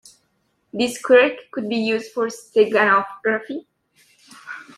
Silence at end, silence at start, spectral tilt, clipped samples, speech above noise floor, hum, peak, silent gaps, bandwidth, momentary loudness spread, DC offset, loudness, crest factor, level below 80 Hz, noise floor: 0.15 s; 0.75 s; -4 dB/octave; under 0.1%; 49 dB; none; -2 dBFS; none; 14 kHz; 19 LU; under 0.1%; -19 LUFS; 20 dB; -70 dBFS; -68 dBFS